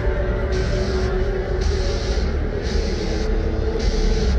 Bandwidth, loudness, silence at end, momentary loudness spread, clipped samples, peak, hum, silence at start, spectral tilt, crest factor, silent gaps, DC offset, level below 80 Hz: 8.4 kHz; -23 LUFS; 0 s; 2 LU; under 0.1%; -8 dBFS; none; 0 s; -6 dB/octave; 12 dB; none; under 0.1%; -22 dBFS